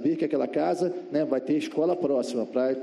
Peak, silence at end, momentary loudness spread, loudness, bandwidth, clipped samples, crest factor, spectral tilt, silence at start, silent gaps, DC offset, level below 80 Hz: -12 dBFS; 0 s; 3 LU; -27 LUFS; 12 kHz; under 0.1%; 14 dB; -6.5 dB/octave; 0 s; none; under 0.1%; -74 dBFS